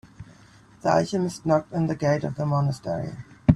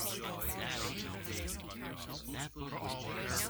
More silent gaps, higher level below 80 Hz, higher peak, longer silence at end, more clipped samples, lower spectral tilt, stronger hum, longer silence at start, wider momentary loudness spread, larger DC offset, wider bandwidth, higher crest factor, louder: neither; first, -44 dBFS vs -52 dBFS; first, 0 dBFS vs -20 dBFS; about the same, 0 s vs 0 s; neither; first, -7.5 dB/octave vs -3 dB/octave; neither; first, 0.2 s vs 0 s; about the same, 8 LU vs 6 LU; neither; second, 12 kHz vs over 20 kHz; about the same, 24 dB vs 20 dB; first, -25 LUFS vs -40 LUFS